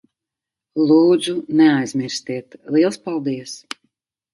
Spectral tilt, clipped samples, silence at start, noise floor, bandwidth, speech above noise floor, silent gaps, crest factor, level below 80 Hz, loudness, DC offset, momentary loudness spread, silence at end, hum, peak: -5.5 dB/octave; under 0.1%; 0.75 s; -86 dBFS; 11.5 kHz; 69 dB; none; 16 dB; -68 dBFS; -18 LUFS; under 0.1%; 17 LU; 0.75 s; none; -2 dBFS